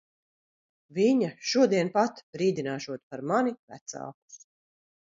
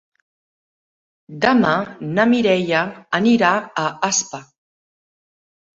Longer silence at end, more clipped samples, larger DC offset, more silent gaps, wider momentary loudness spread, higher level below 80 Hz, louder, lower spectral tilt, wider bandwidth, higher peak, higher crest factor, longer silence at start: second, 0.75 s vs 1.3 s; neither; neither; first, 2.23-2.33 s, 3.03-3.10 s, 3.59-3.68 s, 3.81-3.86 s, 4.14-4.28 s vs none; first, 17 LU vs 8 LU; second, -78 dBFS vs -62 dBFS; second, -27 LUFS vs -18 LUFS; about the same, -5 dB/octave vs -4 dB/octave; about the same, 7.8 kHz vs 7.8 kHz; second, -10 dBFS vs -2 dBFS; about the same, 18 dB vs 18 dB; second, 0.95 s vs 1.3 s